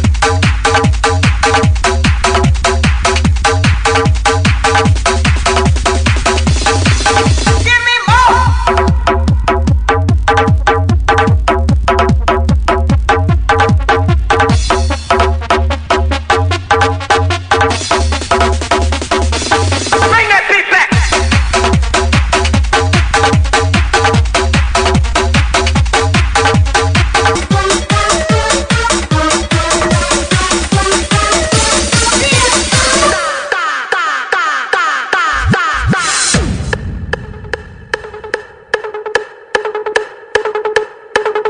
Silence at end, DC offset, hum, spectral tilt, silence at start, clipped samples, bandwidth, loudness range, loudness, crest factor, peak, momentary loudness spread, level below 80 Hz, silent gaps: 0 s; under 0.1%; none; -4 dB/octave; 0 s; under 0.1%; 10.5 kHz; 3 LU; -11 LUFS; 10 dB; 0 dBFS; 7 LU; -16 dBFS; none